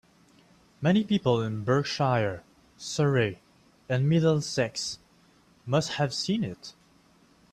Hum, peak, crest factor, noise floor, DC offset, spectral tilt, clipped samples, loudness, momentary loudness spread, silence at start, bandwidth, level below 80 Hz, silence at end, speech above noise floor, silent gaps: none; -10 dBFS; 18 dB; -61 dBFS; under 0.1%; -5.5 dB/octave; under 0.1%; -27 LUFS; 18 LU; 0.8 s; 12.5 kHz; -62 dBFS; 0.8 s; 35 dB; none